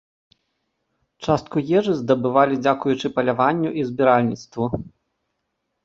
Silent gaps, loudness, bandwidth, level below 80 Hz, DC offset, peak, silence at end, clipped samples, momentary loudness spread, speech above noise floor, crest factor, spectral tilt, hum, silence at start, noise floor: none; -20 LUFS; 7.8 kHz; -54 dBFS; under 0.1%; -2 dBFS; 0.95 s; under 0.1%; 9 LU; 56 dB; 20 dB; -7 dB/octave; none; 1.2 s; -76 dBFS